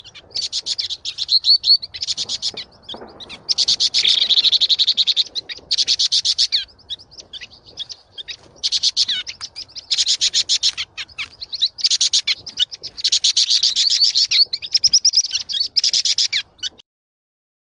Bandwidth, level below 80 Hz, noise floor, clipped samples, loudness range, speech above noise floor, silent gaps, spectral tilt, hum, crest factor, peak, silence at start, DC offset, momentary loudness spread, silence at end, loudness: 10.5 kHz; -60 dBFS; -38 dBFS; under 0.1%; 6 LU; 12 dB; none; 3 dB/octave; none; 16 dB; -4 dBFS; 0.05 s; under 0.1%; 20 LU; 1 s; -15 LUFS